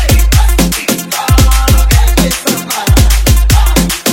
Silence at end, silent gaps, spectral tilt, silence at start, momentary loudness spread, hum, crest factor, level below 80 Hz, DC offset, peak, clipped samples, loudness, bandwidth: 0 s; none; -4 dB/octave; 0 s; 5 LU; none; 8 dB; -10 dBFS; under 0.1%; 0 dBFS; 1%; -10 LUFS; 17 kHz